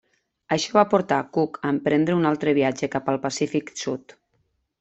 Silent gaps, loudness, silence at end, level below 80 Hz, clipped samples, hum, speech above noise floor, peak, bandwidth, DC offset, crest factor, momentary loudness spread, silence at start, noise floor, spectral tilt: none; -23 LUFS; 0.85 s; -64 dBFS; under 0.1%; none; 48 dB; -2 dBFS; 8.2 kHz; under 0.1%; 20 dB; 8 LU; 0.5 s; -70 dBFS; -5.5 dB/octave